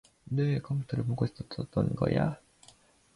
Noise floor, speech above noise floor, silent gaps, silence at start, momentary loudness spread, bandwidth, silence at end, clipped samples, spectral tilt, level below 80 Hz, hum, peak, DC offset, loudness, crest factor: -61 dBFS; 31 dB; none; 0.3 s; 7 LU; 11 kHz; 0.8 s; under 0.1%; -8.5 dB/octave; -54 dBFS; none; -12 dBFS; under 0.1%; -32 LUFS; 18 dB